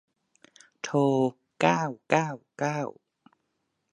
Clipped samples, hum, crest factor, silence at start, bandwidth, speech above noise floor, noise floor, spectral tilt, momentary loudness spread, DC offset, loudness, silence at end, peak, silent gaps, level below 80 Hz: under 0.1%; none; 26 dB; 0.85 s; 10.5 kHz; 52 dB; -78 dBFS; -6 dB/octave; 10 LU; under 0.1%; -27 LUFS; 1 s; -4 dBFS; none; -78 dBFS